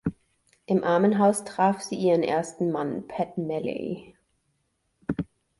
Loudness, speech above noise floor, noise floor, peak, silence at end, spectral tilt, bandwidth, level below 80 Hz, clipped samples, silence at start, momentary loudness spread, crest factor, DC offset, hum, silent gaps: -26 LUFS; 49 dB; -74 dBFS; -8 dBFS; 0.35 s; -6 dB/octave; 11.5 kHz; -58 dBFS; under 0.1%; 0.05 s; 13 LU; 18 dB; under 0.1%; none; none